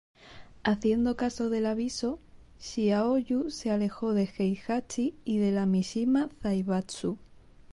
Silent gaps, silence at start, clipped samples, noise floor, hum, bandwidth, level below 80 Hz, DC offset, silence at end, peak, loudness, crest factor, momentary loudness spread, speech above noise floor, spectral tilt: none; 0.25 s; under 0.1%; -50 dBFS; none; 11.5 kHz; -56 dBFS; under 0.1%; 0.5 s; -14 dBFS; -29 LUFS; 14 dB; 8 LU; 21 dB; -6 dB/octave